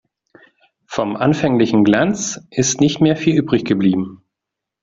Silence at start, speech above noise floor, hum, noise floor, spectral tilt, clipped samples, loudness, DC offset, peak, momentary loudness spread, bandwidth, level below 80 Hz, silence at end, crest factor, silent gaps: 0.9 s; 67 dB; none; -82 dBFS; -5 dB/octave; under 0.1%; -16 LUFS; under 0.1%; 0 dBFS; 9 LU; 7.8 kHz; -52 dBFS; 0.65 s; 16 dB; none